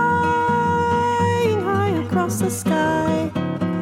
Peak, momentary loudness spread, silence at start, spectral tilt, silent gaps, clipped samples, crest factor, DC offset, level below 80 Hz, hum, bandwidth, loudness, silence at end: -6 dBFS; 4 LU; 0 s; -6 dB/octave; none; under 0.1%; 12 dB; under 0.1%; -50 dBFS; none; 16.5 kHz; -20 LUFS; 0 s